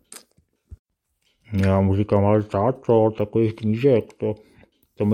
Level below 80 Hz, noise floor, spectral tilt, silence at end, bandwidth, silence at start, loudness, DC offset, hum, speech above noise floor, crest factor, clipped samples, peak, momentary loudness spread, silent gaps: -54 dBFS; -70 dBFS; -9 dB/octave; 0 s; 11.5 kHz; 0.15 s; -21 LUFS; under 0.1%; none; 50 dB; 16 dB; under 0.1%; -4 dBFS; 10 LU; 0.79-0.85 s